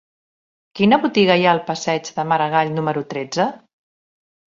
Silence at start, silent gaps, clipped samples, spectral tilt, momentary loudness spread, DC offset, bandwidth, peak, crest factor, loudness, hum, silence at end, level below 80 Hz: 0.75 s; none; under 0.1%; -5 dB/octave; 9 LU; under 0.1%; 7.6 kHz; -2 dBFS; 18 dB; -18 LUFS; none; 0.9 s; -62 dBFS